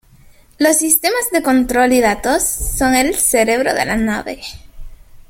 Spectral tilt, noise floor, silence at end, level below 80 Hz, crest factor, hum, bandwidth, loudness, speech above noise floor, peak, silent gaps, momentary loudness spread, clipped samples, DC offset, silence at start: -2.5 dB/octave; -46 dBFS; 0.1 s; -34 dBFS; 16 dB; none; 17 kHz; -14 LUFS; 31 dB; 0 dBFS; none; 7 LU; under 0.1%; under 0.1%; 0.6 s